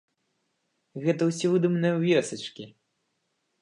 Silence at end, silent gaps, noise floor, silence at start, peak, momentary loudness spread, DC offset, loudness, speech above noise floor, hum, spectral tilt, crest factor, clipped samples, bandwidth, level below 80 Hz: 0.95 s; none; -77 dBFS; 0.95 s; -10 dBFS; 20 LU; under 0.1%; -25 LUFS; 51 dB; none; -6 dB/octave; 18 dB; under 0.1%; 11 kHz; -78 dBFS